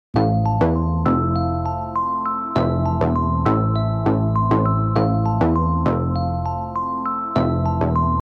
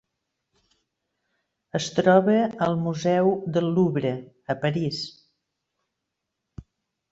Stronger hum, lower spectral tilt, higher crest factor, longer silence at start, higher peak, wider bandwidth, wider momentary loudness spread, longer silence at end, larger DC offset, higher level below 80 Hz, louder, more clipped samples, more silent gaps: neither; first, -10 dB/octave vs -6.5 dB/octave; second, 14 dB vs 20 dB; second, 0.15 s vs 1.75 s; about the same, -4 dBFS vs -4 dBFS; second, 6 kHz vs 8 kHz; second, 5 LU vs 13 LU; second, 0 s vs 0.5 s; neither; first, -32 dBFS vs -60 dBFS; first, -20 LUFS vs -23 LUFS; neither; neither